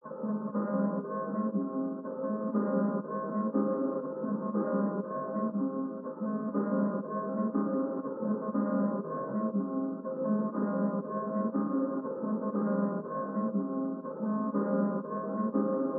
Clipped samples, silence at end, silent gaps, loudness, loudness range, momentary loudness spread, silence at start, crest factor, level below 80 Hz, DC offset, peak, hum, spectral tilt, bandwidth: under 0.1%; 0 s; none; -32 LUFS; 1 LU; 5 LU; 0.05 s; 16 dB; under -90 dBFS; under 0.1%; -16 dBFS; none; -6.5 dB/octave; 2 kHz